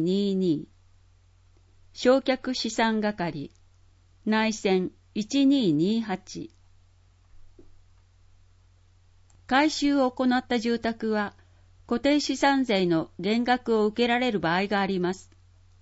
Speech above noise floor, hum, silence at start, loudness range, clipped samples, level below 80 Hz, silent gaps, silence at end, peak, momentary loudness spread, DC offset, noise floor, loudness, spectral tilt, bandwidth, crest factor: 34 dB; none; 0 s; 5 LU; under 0.1%; -58 dBFS; none; 0.6 s; -8 dBFS; 11 LU; under 0.1%; -58 dBFS; -25 LUFS; -5 dB/octave; 8 kHz; 20 dB